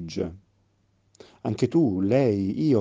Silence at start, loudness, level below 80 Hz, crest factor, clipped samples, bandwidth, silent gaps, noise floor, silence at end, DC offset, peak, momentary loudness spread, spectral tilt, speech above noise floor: 0 s; -24 LUFS; -58 dBFS; 16 dB; under 0.1%; 7.8 kHz; none; -66 dBFS; 0 s; under 0.1%; -8 dBFS; 11 LU; -8 dB/octave; 44 dB